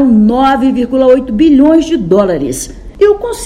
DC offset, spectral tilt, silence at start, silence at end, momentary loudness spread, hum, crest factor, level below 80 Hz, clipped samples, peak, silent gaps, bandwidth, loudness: under 0.1%; -6 dB/octave; 0 s; 0 s; 9 LU; none; 8 dB; -32 dBFS; 1%; 0 dBFS; none; 13.5 kHz; -9 LUFS